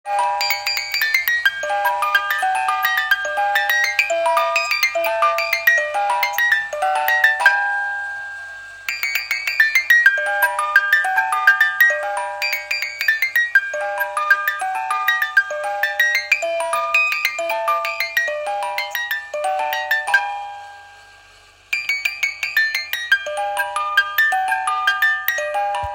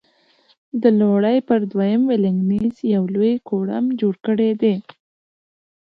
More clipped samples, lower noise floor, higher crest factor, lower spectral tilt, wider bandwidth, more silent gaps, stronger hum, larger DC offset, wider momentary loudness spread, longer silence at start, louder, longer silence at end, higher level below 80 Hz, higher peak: neither; second, -48 dBFS vs -58 dBFS; about the same, 20 dB vs 16 dB; second, 1 dB/octave vs -10 dB/octave; first, 17 kHz vs 4.9 kHz; neither; neither; neither; first, 8 LU vs 5 LU; second, 0.05 s vs 0.75 s; about the same, -18 LUFS vs -19 LUFS; second, 0 s vs 1.1 s; about the same, -60 dBFS vs -60 dBFS; about the same, 0 dBFS vs -2 dBFS